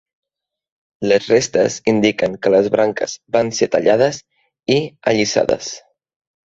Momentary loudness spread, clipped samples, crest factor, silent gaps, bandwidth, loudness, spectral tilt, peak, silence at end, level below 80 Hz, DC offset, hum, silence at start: 10 LU; under 0.1%; 16 dB; none; 8 kHz; -17 LUFS; -4.5 dB/octave; 0 dBFS; 0.7 s; -54 dBFS; under 0.1%; none; 1 s